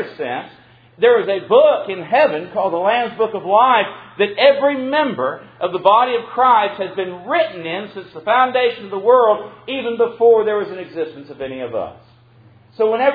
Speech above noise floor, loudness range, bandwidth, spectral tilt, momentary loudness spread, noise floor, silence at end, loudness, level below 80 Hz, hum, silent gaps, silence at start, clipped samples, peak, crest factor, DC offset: 31 dB; 2 LU; 4.9 kHz; -7.5 dB/octave; 13 LU; -48 dBFS; 0 s; -17 LUFS; -64 dBFS; none; none; 0 s; under 0.1%; 0 dBFS; 16 dB; under 0.1%